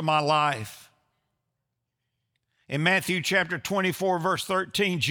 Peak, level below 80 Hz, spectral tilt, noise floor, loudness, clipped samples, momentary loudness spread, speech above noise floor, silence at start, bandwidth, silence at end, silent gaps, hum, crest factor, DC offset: -8 dBFS; -68 dBFS; -4 dB/octave; -82 dBFS; -25 LUFS; under 0.1%; 5 LU; 56 dB; 0 s; over 20 kHz; 0 s; none; none; 20 dB; under 0.1%